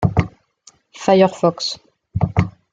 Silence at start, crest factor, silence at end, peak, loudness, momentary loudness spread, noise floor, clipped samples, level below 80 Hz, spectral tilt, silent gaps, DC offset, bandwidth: 0 s; 18 dB; 0.25 s; -2 dBFS; -18 LUFS; 15 LU; -52 dBFS; under 0.1%; -40 dBFS; -6.5 dB/octave; none; under 0.1%; 9 kHz